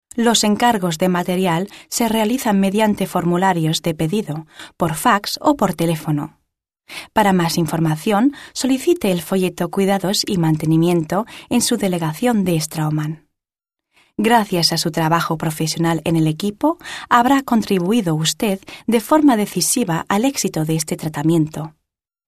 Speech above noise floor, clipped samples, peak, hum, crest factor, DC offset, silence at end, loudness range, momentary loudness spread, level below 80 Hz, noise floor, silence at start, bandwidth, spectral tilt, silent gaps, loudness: 68 dB; under 0.1%; 0 dBFS; none; 18 dB; under 0.1%; 0.6 s; 2 LU; 8 LU; -52 dBFS; -85 dBFS; 0.15 s; 14 kHz; -5 dB/octave; none; -18 LUFS